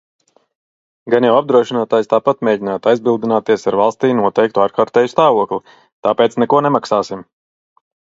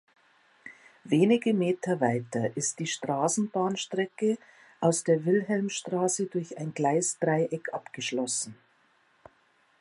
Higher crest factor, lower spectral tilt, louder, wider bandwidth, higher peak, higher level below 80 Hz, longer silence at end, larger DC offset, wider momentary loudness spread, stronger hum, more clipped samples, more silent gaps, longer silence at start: about the same, 16 dB vs 18 dB; first, -6 dB/octave vs -4.5 dB/octave; first, -15 LUFS vs -28 LUFS; second, 7.8 kHz vs 11.5 kHz; first, 0 dBFS vs -10 dBFS; first, -62 dBFS vs -76 dBFS; second, 0.8 s vs 1.25 s; neither; second, 6 LU vs 10 LU; neither; neither; first, 5.92-6.03 s vs none; first, 1.05 s vs 0.65 s